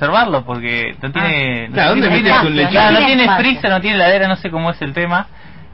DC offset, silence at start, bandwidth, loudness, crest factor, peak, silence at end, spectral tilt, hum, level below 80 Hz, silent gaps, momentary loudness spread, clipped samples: 1%; 0 s; 5.8 kHz; -13 LUFS; 12 dB; -2 dBFS; 0.1 s; -8 dB/octave; none; -42 dBFS; none; 9 LU; under 0.1%